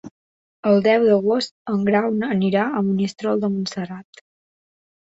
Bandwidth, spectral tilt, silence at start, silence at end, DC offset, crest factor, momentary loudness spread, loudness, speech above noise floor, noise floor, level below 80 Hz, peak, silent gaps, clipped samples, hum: 8 kHz; -6.5 dB/octave; 0.05 s; 1.05 s; under 0.1%; 18 dB; 11 LU; -20 LUFS; over 71 dB; under -90 dBFS; -64 dBFS; -4 dBFS; 0.11-0.63 s, 1.51-1.65 s; under 0.1%; none